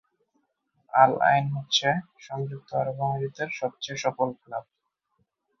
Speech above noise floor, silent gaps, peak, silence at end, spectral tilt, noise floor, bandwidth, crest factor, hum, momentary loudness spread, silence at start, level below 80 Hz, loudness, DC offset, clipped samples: 49 dB; none; -4 dBFS; 1 s; -4.5 dB/octave; -75 dBFS; 7.4 kHz; 24 dB; none; 14 LU; 0.95 s; -68 dBFS; -26 LUFS; under 0.1%; under 0.1%